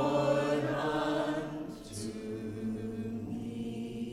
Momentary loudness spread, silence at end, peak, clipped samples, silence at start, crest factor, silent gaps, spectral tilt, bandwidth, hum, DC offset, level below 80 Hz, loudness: 11 LU; 0 s; -18 dBFS; under 0.1%; 0 s; 16 dB; none; -6 dB/octave; 15 kHz; none; under 0.1%; -58 dBFS; -35 LUFS